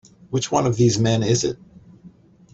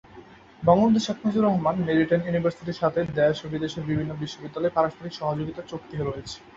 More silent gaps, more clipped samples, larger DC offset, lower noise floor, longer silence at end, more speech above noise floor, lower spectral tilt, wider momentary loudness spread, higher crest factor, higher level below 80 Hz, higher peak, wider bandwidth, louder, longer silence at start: neither; neither; neither; about the same, -48 dBFS vs -48 dBFS; first, 0.45 s vs 0.05 s; first, 29 dB vs 24 dB; second, -5.5 dB/octave vs -7 dB/octave; about the same, 10 LU vs 11 LU; about the same, 18 dB vs 20 dB; about the same, -50 dBFS vs -54 dBFS; about the same, -4 dBFS vs -6 dBFS; about the same, 8 kHz vs 7.8 kHz; first, -20 LUFS vs -25 LUFS; first, 0.3 s vs 0.1 s